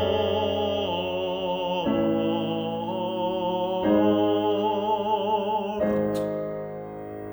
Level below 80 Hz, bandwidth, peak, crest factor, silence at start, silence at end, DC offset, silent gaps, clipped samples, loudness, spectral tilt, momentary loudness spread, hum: -56 dBFS; over 20 kHz; -10 dBFS; 14 dB; 0 s; 0 s; under 0.1%; none; under 0.1%; -25 LUFS; -7 dB/octave; 7 LU; none